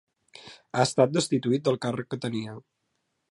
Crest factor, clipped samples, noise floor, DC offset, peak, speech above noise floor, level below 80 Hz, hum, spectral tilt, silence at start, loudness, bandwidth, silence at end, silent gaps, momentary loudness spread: 22 dB; under 0.1%; -77 dBFS; under 0.1%; -8 dBFS; 51 dB; -70 dBFS; none; -5.5 dB/octave; 0.35 s; -26 LUFS; 11.5 kHz; 0.7 s; none; 24 LU